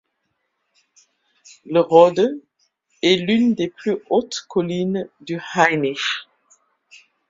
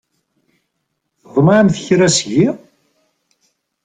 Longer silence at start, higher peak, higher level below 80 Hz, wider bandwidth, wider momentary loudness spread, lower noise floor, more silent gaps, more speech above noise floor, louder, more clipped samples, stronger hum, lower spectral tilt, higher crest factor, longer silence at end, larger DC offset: first, 1.65 s vs 1.35 s; about the same, 0 dBFS vs -2 dBFS; second, -64 dBFS vs -54 dBFS; second, 7.6 kHz vs 9.6 kHz; first, 13 LU vs 8 LU; about the same, -73 dBFS vs -72 dBFS; neither; second, 55 dB vs 59 dB; second, -19 LUFS vs -13 LUFS; neither; neither; about the same, -5 dB/octave vs -5 dB/octave; about the same, 20 dB vs 16 dB; second, 1.05 s vs 1.3 s; neither